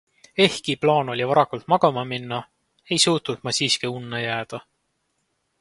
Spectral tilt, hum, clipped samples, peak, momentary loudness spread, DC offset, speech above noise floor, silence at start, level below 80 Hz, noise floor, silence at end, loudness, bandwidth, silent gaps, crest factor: -3.5 dB/octave; none; under 0.1%; -2 dBFS; 11 LU; under 0.1%; 51 dB; 0.35 s; -64 dBFS; -73 dBFS; 1 s; -22 LUFS; 11.5 kHz; none; 22 dB